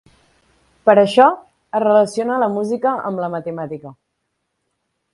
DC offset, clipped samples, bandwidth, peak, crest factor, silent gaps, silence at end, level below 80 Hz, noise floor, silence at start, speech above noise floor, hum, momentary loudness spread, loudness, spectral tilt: under 0.1%; under 0.1%; 11.5 kHz; 0 dBFS; 18 dB; none; 1.2 s; -64 dBFS; -73 dBFS; 0.85 s; 57 dB; none; 15 LU; -16 LUFS; -6 dB/octave